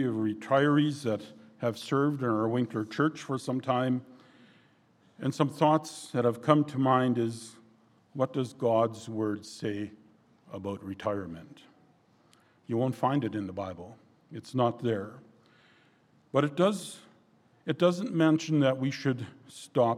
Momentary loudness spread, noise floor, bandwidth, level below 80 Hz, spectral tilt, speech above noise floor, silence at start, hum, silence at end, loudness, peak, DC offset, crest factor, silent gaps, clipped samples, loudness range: 17 LU; -64 dBFS; 13.5 kHz; -74 dBFS; -6.5 dB/octave; 36 dB; 0 s; none; 0 s; -29 LUFS; -6 dBFS; under 0.1%; 24 dB; none; under 0.1%; 7 LU